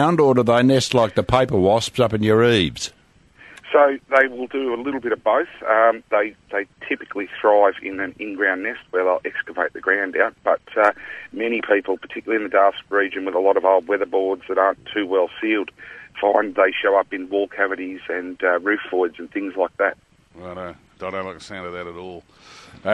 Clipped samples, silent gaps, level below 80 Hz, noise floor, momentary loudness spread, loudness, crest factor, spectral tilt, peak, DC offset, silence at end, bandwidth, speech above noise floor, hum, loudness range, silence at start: under 0.1%; none; -52 dBFS; -50 dBFS; 14 LU; -20 LUFS; 18 dB; -5.5 dB/octave; -2 dBFS; under 0.1%; 0 s; 12 kHz; 30 dB; none; 5 LU; 0 s